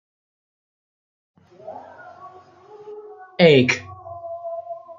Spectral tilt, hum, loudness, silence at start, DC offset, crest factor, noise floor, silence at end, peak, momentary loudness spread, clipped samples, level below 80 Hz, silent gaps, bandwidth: -5.5 dB/octave; none; -18 LUFS; 1.65 s; under 0.1%; 22 dB; -46 dBFS; 0.05 s; -2 dBFS; 28 LU; under 0.1%; -66 dBFS; none; 7.6 kHz